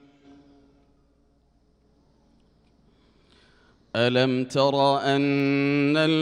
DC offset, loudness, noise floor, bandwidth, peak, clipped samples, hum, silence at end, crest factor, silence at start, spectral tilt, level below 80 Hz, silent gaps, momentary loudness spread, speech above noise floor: under 0.1%; -22 LUFS; -63 dBFS; 10.5 kHz; -8 dBFS; under 0.1%; none; 0 s; 18 dB; 3.95 s; -6 dB/octave; -66 dBFS; none; 3 LU; 42 dB